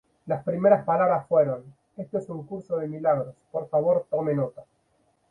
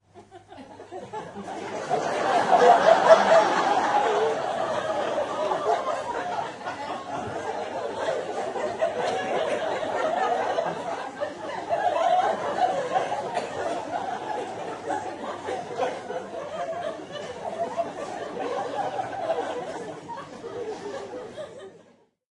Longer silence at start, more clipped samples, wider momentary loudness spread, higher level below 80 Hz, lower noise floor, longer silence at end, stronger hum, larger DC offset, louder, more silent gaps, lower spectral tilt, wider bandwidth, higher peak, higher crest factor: about the same, 0.25 s vs 0.15 s; neither; about the same, 14 LU vs 16 LU; about the same, -68 dBFS vs -70 dBFS; first, -68 dBFS vs -58 dBFS; about the same, 0.65 s vs 0.55 s; neither; neither; about the same, -25 LUFS vs -26 LUFS; neither; first, -10.5 dB/octave vs -4 dB/octave; second, 2.7 kHz vs 11 kHz; second, -6 dBFS vs -2 dBFS; about the same, 20 dB vs 24 dB